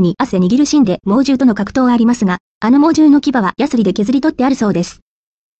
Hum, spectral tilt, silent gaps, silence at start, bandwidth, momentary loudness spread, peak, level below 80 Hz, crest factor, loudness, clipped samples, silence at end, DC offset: none; -6 dB/octave; 2.40-2.61 s; 0 s; 8.4 kHz; 6 LU; -2 dBFS; -46 dBFS; 10 dB; -13 LUFS; under 0.1%; 0.65 s; under 0.1%